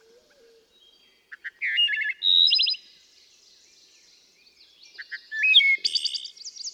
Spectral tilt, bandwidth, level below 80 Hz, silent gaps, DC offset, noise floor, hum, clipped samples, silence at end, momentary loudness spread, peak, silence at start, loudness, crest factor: 5 dB/octave; 13.5 kHz; -84 dBFS; none; under 0.1%; -59 dBFS; none; under 0.1%; 0.05 s; 22 LU; -6 dBFS; 1.3 s; -20 LUFS; 20 dB